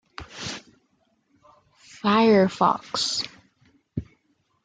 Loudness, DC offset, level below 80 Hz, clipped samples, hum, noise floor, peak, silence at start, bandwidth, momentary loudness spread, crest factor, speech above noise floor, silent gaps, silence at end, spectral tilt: -23 LUFS; under 0.1%; -58 dBFS; under 0.1%; none; -69 dBFS; -6 dBFS; 0.2 s; 9.4 kHz; 19 LU; 20 dB; 48 dB; none; 0.6 s; -4.5 dB/octave